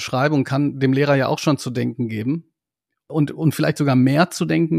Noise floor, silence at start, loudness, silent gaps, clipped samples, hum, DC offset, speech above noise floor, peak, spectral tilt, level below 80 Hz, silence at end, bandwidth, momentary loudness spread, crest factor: -82 dBFS; 0 s; -20 LUFS; none; under 0.1%; none; under 0.1%; 63 dB; -2 dBFS; -6.5 dB/octave; -62 dBFS; 0 s; 15 kHz; 8 LU; 16 dB